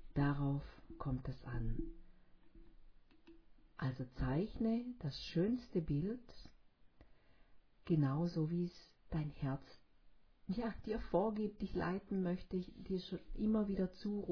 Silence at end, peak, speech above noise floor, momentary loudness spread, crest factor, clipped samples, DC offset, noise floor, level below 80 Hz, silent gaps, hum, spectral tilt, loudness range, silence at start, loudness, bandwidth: 0 s; -22 dBFS; 25 dB; 10 LU; 20 dB; under 0.1%; under 0.1%; -64 dBFS; -54 dBFS; none; none; -7.5 dB/octave; 5 LU; 0 s; -41 LUFS; 5.4 kHz